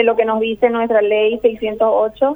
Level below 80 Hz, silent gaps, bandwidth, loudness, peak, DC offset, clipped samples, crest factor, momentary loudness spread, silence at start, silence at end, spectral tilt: -50 dBFS; none; over 20 kHz; -16 LUFS; -2 dBFS; under 0.1%; under 0.1%; 14 dB; 3 LU; 0 s; 0 s; -7 dB/octave